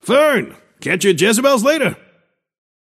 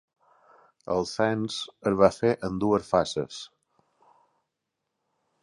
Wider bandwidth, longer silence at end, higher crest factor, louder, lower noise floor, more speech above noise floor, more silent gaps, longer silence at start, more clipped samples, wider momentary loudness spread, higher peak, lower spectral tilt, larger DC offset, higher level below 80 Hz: first, 15.5 kHz vs 11.5 kHz; second, 1.05 s vs 1.95 s; second, 16 dB vs 24 dB; first, -15 LUFS vs -26 LUFS; second, -59 dBFS vs -83 dBFS; second, 44 dB vs 57 dB; neither; second, 0.05 s vs 0.85 s; neither; second, 9 LU vs 16 LU; first, 0 dBFS vs -4 dBFS; second, -3.5 dB/octave vs -5.5 dB/octave; neither; second, -64 dBFS vs -58 dBFS